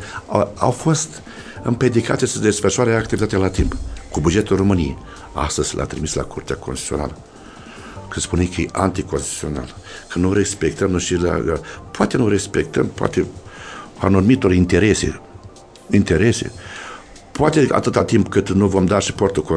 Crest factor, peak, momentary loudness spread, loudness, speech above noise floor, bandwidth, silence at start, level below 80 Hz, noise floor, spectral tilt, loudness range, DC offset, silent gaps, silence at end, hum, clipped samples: 18 dB; 0 dBFS; 18 LU; -19 LUFS; 23 dB; 11 kHz; 0 s; -36 dBFS; -41 dBFS; -5.5 dB/octave; 6 LU; under 0.1%; none; 0 s; none; under 0.1%